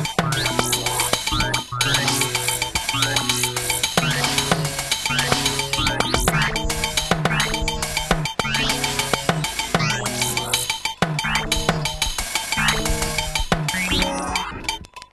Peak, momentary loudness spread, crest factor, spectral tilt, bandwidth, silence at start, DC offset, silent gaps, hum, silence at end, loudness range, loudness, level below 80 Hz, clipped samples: -4 dBFS; 4 LU; 18 dB; -2.5 dB/octave; 13 kHz; 0 s; under 0.1%; none; none; 0.05 s; 2 LU; -20 LUFS; -34 dBFS; under 0.1%